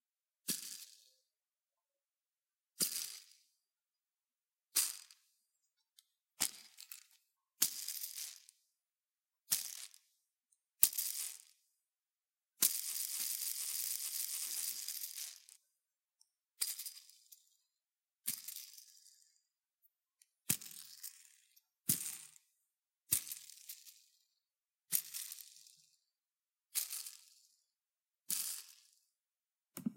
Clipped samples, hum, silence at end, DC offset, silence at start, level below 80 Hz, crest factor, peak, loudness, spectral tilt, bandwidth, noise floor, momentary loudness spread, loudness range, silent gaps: under 0.1%; none; 0 s; under 0.1%; 0.45 s; under -90 dBFS; 42 dB; -4 dBFS; -38 LUFS; 0 dB/octave; 17 kHz; under -90 dBFS; 20 LU; 9 LU; none